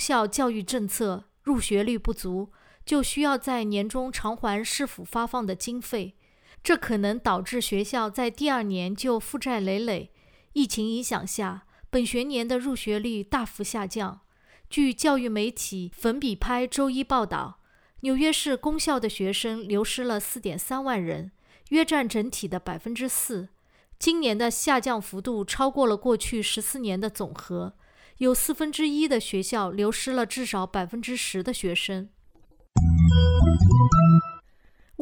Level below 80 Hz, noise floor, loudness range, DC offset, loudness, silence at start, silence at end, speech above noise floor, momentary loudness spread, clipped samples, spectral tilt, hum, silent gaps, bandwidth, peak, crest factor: -40 dBFS; -57 dBFS; 4 LU; under 0.1%; -26 LUFS; 0 s; 0 s; 31 dB; 10 LU; under 0.1%; -5 dB/octave; none; none; over 20 kHz; -6 dBFS; 20 dB